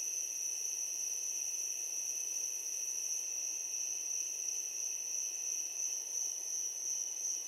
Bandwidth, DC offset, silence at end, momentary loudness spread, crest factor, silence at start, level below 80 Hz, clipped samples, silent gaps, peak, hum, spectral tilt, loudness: 16 kHz; under 0.1%; 0 s; 1 LU; 14 dB; 0 s; under -90 dBFS; under 0.1%; none; -24 dBFS; none; 5 dB/octave; -36 LUFS